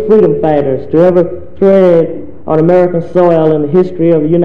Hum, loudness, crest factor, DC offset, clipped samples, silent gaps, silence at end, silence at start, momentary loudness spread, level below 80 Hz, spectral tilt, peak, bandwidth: none; -9 LUFS; 10 dB; 5%; 1%; none; 0 s; 0 s; 5 LU; -40 dBFS; -10 dB/octave; 0 dBFS; 5.4 kHz